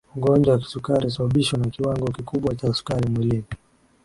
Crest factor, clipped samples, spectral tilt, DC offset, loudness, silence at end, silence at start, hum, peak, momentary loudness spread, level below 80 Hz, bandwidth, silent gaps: 16 dB; under 0.1%; -7 dB/octave; under 0.1%; -22 LUFS; 0.5 s; 0.15 s; none; -6 dBFS; 8 LU; -46 dBFS; 11.5 kHz; none